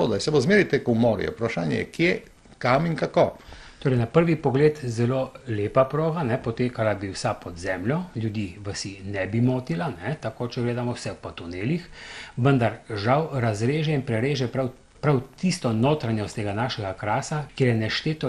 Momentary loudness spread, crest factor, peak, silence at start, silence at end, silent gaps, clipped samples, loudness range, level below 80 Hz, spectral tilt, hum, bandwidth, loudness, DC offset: 10 LU; 18 dB; -6 dBFS; 0 s; 0 s; none; under 0.1%; 5 LU; -52 dBFS; -6.5 dB/octave; none; 12 kHz; -25 LUFS; under 0.1%